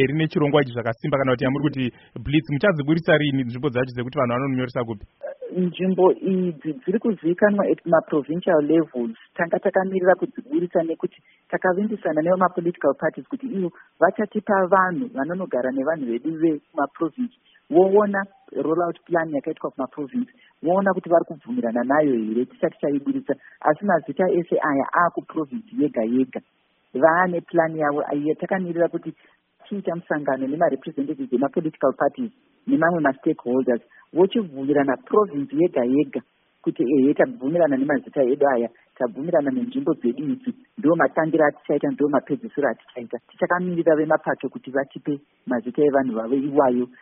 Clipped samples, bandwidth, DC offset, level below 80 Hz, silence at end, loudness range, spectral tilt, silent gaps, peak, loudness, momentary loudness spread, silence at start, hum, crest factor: under 0.1%; 3.9 kHz; under 0.1%; -58 dBFS; 0.15 s; 3 LU; -3.5 dB/octave; none; -2 dBFS; -22 LUFS; 10 LU; 0 s; none; 20 dB